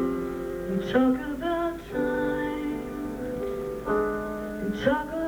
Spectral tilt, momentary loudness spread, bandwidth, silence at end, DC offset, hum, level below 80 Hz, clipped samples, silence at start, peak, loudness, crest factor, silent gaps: -6.5 dB/octave; 9 LU; over 20 kHz; 0 s; under 0.1%; none; -46 dBFS; under 0.1%; 0 s; -10 dBFS; -28 LUFS; 18 dB; none